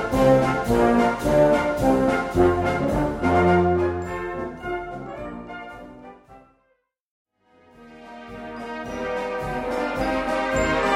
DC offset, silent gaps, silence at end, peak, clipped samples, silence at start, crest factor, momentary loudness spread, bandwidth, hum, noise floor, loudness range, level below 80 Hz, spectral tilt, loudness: under 0.1%; 7.01-7.25 s; 0 s; -4 dBFS; under 0.1%; 0 s; 18 dB; 18 LU; 16 kHz; none; -69 dBFS; 21 LU; -40 dBFS; -6.5 dB/octave; -22 LUFS